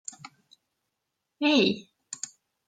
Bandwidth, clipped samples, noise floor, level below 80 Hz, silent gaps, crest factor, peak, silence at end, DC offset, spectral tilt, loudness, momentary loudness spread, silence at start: 9.4 kHz; under 0.1%; -83 dBFS; -74 dBFS; none; 22 dB; -10 dBFS; 0.55 s; under 0.1%; -3.5 dB/octave; -26 LUFS; 20 LU; 1.4 s